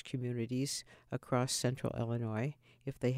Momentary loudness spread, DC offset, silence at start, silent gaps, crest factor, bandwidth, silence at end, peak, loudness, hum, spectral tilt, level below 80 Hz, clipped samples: 11 LU; under 0.1%; 0.05 s; none; 16 dB; 16 kHz; 0 s; -20 dBFS; -37 LUFS; none; -5 dB/octave; -66 dBFS; under 0.1%